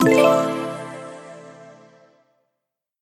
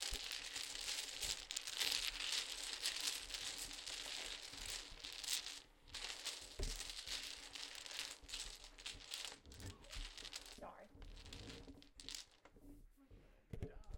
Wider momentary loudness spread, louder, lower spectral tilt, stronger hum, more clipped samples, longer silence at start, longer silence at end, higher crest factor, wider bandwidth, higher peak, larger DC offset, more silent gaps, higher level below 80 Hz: first, 26 LU vs 16 LU; first, -19 LUFS vs -46 LUFS; first, -5.5 dB/octave vs -0.5 dB/octave; neither; neither; about the same, 0 s vs 0 s; first, 1.4 s vs 0 s; second, 20 dB vs 28 dB; about the same, 16 kHz vs 17 kHz; first, -2 dBFS vs -20 dBFS; neither; neither; second, -68 dBFS vs -60 dBFS